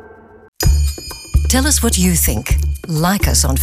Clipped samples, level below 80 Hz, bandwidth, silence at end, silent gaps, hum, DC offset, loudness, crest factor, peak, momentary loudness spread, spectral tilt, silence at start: under 0.1%; -20 dBFS; 16 kHz; 0 s; 0.48-0.53 s; none; under 0.1%; -15 LUFS; 12 dB; -2 dBFS; 7 LU; -4 dB/octave; 0.05 s